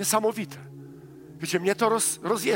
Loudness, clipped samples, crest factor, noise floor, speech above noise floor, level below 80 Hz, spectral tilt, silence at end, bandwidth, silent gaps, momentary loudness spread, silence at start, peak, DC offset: -25 LUFS; under 0.1%; 18 dB; -45 dBFS; 20 dB; -68 dBFS; -3 dB/octave; 0 s; 16.5 kHz; none; 23 LU; 0 s; -8 dBFS; under 0.1%